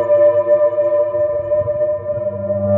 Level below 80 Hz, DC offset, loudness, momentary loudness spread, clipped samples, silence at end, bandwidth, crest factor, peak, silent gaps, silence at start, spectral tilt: -52 dBFS; under 0.1%; -16 LUFS; 8 LU; under 0.1%; 0 s; 3.1 kHz; 12 dB; -4 dBFS; none; 0 s; -11 dB/octave